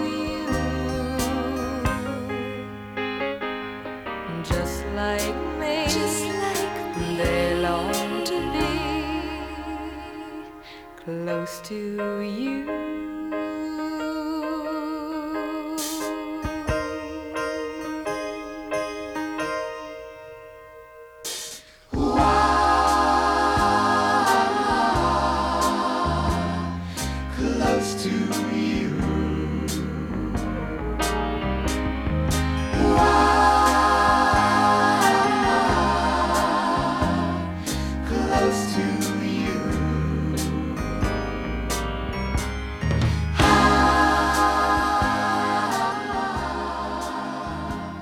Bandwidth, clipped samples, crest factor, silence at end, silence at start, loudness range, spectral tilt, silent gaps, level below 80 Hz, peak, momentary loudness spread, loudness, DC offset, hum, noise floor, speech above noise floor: over 20 kHz; under 0.1%; 20 dB; 0 s; 0 s; 10 LU; -5 dB/octave; none; -34 dBFS; -4 dBFS; 13 LU; -23 LUFS; under 0.1%; none; -44 dBFS; 18 dB